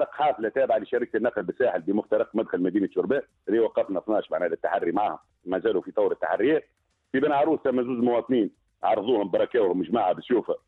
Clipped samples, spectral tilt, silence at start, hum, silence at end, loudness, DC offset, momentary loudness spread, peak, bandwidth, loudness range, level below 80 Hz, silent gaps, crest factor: under 0.1%; -8.5 dB/octave; 0 s; none; 0.1 s; -25 LUFS; under 0.1%; 4 LU; -10 dBFS; 4.2 kHz; 2 LU; -66 dBFS; none; 16 dB